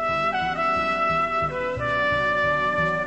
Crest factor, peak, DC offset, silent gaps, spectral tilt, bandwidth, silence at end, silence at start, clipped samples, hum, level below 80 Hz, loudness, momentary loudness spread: 12 dB; -12 dBFS; 0.3%; none; -5.5 dB/octave; 8.6 kHz; 0 s; 0 s; under 0.1%; none; -46 dBFS; -22 LUFS; 3 LU